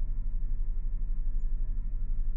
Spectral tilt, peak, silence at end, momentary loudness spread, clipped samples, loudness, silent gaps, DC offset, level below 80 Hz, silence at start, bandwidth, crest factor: -11.5 dB/octave; -20 dBFS; 0 s; 1 LU; under 0.1%; -38 LUFS; none; under 0.1%; -28 dBFS; 0 s; 1 kHz; 8 dB